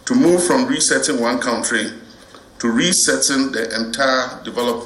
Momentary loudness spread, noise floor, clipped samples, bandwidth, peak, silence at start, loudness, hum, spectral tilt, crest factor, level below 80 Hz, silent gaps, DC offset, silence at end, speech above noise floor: 8 LU; -43 dBFS; under 0.1%; 15.5 kHz; -2 dBFS; 0.05 s; -17 LUFS; none; -2.5 dB/octave; 16 dB; -54 dBFS; none; under 0.1%; 0 s; 26 dB